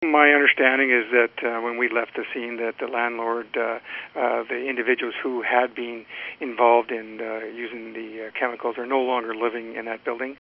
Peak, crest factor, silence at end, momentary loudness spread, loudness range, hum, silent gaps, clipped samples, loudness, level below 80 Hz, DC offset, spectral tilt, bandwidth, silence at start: 0 dBFS; 24 dB; 0.05 s; 15 LU; 5 LU; none; none; under 0.1%; -23 LUFS; -76 dBFS; under 0.1%; 0 dB/octave; 5.6 kHz; 0 s